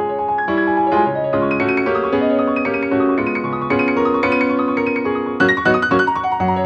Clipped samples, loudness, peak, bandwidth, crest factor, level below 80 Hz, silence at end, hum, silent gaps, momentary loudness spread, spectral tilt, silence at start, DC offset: under 0.1%; -17 LUFS; -2 dBFS; 8 kHz; 14 dB; -48 dBFS; 0 s; none; none; 4 LU; -7.5 dB/octave; 0 s; under 0.1%